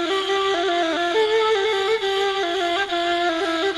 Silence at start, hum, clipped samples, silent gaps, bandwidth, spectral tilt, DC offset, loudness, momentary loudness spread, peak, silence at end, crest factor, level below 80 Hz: 0 s; none; under 0.1%; none; 12 kHz; -2 dB/octave; under 0.1%; -21 LUFS; 3 LU; -10 dBFS; 0 s; 12 dB; -58 dBFS